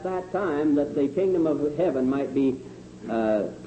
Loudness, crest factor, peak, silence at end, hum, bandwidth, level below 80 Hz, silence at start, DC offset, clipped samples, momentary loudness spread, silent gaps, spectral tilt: -25 LUFS; 12 dB; -12 dBFS; 0 s; 60 Hz at -60 dBFS; 8.6 kHz; -56 dBFS; 0 s; under 0.1%; under 0.1%; 7 LU; none; -8 dB/octave